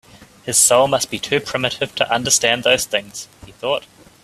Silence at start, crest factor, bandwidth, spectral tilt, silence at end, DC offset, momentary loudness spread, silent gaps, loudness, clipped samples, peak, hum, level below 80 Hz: 0.2 s; 20 dB; 16 kHz; -1.5 dB/octave; 0.45 s; under 0.1%; 17 LU; none; -17 LUFS; under 0.1%; 0 dBFS; none; -54 dBFS